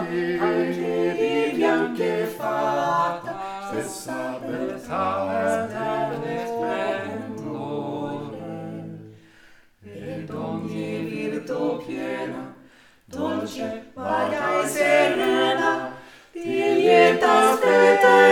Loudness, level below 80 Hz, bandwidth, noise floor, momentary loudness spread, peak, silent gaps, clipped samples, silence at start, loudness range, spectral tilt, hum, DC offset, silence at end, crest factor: -23 LUFS; -64 dBFS; 18.5 kHz; -52 dBFS; 17 LU; -2 dBFS; none; under 0.1%; 0 s; 13 LU; -4.5 dB/octave; none; under 0.1%; 0 s; 20 dB